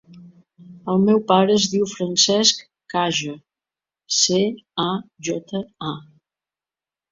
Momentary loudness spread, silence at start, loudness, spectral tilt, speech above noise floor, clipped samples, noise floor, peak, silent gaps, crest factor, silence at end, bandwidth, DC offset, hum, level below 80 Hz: 15 LU; 0.1 s; -20 LUFS; -3.5 dB/octave; over 70 dB; under 0.1%; under -90 dBFS; -2 dBFS; none; 20 dB; 1.1 s; 7.8 kHz; under 0.1%; none; -62 dBFS